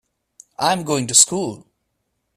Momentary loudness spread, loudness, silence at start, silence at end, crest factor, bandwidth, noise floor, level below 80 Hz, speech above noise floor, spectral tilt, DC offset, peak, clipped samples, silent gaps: 13 LU; -16 LUFS; 0.6 s; 0.8 s; 22 dB; 16 kHz; -73 dBFS; -60 dBFS; 55 dB; -2 dB/octave; under 0.1%; 0 dBFS; under 0.1%; none